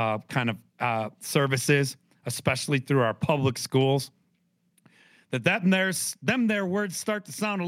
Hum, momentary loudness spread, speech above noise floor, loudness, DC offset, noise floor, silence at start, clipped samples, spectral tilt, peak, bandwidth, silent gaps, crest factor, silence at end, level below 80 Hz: none; 8 LU; 45 dB; -26 LUFS; under 0.1%; -71 dBFS; 0 s; under 0.1%; -5 dB/octave; -8 dBFS; 16.5 kHz; none; 20 dB; 0 s; -68 dBFS